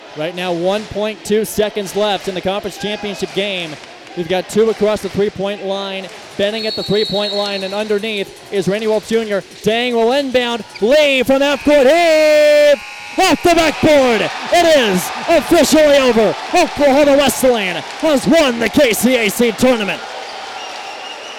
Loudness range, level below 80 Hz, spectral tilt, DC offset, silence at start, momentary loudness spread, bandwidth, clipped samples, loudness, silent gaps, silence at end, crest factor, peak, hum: 7 LU; -44 dBFS; -4 dB/octave; under 0.1%; 0 s; 12 LU; over 20 kHz; under 0.1%; -14 LUFS; none; 0 s; 14 dB; 0 dBFS; none